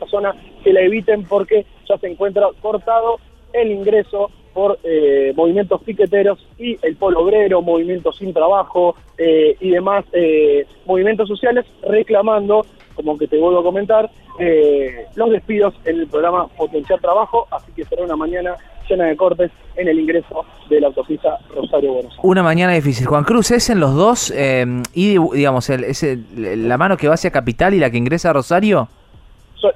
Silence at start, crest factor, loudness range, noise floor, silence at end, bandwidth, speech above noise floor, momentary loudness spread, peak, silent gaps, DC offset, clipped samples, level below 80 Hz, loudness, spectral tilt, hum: 0 s; 14 dB; 3 LU; -44 dBFS; 0 s; 14.5 kHz; 29 dB; 8 LU; 0 dBFS; none; under 0.1%; under 0.1%; -42 dBFS; -16 LUFS; -6 dB/octave; none